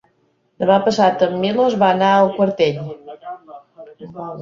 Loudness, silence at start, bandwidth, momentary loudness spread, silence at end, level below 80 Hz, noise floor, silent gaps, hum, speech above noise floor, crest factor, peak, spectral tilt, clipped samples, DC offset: -16 LUFS; 0.6 s; 7.6 kHz; 20 LU; 0 s; -60 dBFS; -63 dBFS; none; none; 47 dB; 16 dB; -2 dBFS; -6 dB/octave; under 0.1%; under 0.1%